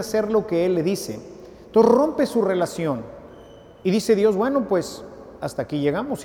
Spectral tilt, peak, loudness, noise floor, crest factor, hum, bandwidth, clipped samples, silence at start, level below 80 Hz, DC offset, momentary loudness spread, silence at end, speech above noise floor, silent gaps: -6 dB/octave; -4 dBFS; -21 LUFS; -45 dBFS; 18 dB; none; 17.5 kHz; under 0.1%; 0 s; -54 dBFS; under 0.1%; 17 LU; 0 s; 24 dB; none